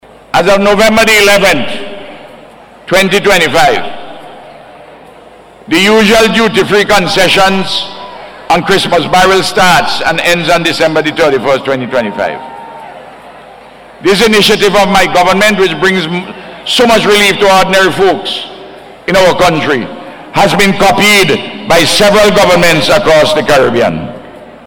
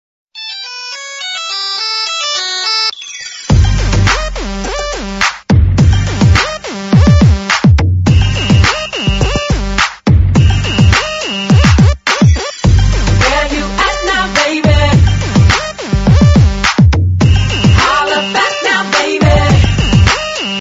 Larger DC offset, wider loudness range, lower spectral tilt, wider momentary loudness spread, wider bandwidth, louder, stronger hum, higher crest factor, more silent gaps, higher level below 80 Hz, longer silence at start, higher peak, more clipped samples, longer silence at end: neither; about the same, 5 LU vs 4 LU; second, -3.5 dB/octave vs -5 dB/octave; first, 16 LU vs 10 LU; first, over 20 kHz vs 8 kHz; first, -8 LUFS vs -11 LUFS; neither; about the same, 8 dB vs 10 dB; neither; second, -36 dBFS vs -16 dBFS; about the same, 0.35 s vs 0.35 s; about the same, -2 dBFS vs 0 dBFS; second, under 0.1% vs 0.4%; first, 0.15 s vs 0 s